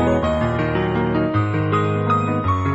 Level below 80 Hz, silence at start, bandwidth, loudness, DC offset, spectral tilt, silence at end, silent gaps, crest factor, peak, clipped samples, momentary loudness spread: -36 dBFS; 0 s; 8 kHz; -20 LUFS; under 0.1%; -8 dB/octave; 0 s; none; 12 dB; -6 dBFS; under 0.1%; 1 LU